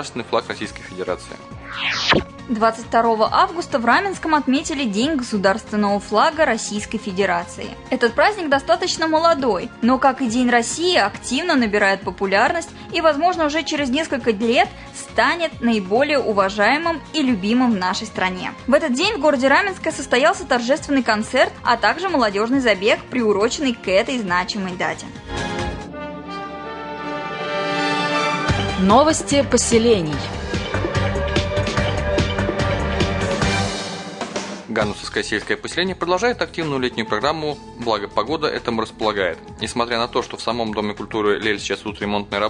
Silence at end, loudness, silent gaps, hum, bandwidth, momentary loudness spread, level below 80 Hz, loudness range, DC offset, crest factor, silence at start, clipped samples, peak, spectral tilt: 0 s; -19 LUFS; none; none; 11 kHz; 10 LU; -40 dBFS; 5 LU; under 0.1%; 16 dB; 0 s; under 0.1%; -2 dBFS; -4 dB/octave